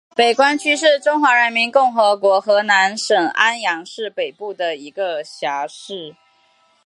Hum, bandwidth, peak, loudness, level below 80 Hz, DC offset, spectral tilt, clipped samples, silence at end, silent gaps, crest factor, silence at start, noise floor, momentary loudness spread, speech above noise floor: none; 11.5 kHz; 0 dBFS; -16 LUFS; -78 dBFS; under 0.1%; -2 dB/octave; under 0.1%; 0.75 s; none; 16 dB; 0.2 s; -58 dBFS; 12 LU; 41 dB